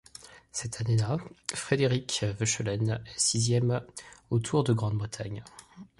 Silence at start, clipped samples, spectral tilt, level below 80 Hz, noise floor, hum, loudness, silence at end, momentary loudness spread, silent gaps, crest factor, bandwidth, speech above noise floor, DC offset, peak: 0.2 s; under 0.1%; -4.5 dB/octave; -56 dBFS; -51 dBFS; none; -29 LUFS; 0.15 s; 18 LU; none; 20 dB; 11.5 kHz; 22 dB; under 0.1%; -10 dBFS